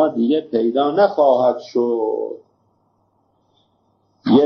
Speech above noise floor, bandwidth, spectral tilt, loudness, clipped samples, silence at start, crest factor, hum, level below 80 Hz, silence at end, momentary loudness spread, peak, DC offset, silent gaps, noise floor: 46 dB; 6.4 kHz; -5.5 dB/octave; -18 LUFS; under 0.1%; 0 s; 16 dB; none; -68 dBFS; 0 s; 12 LU; -2 dBFS; under 0.1%; none; -63 dBFS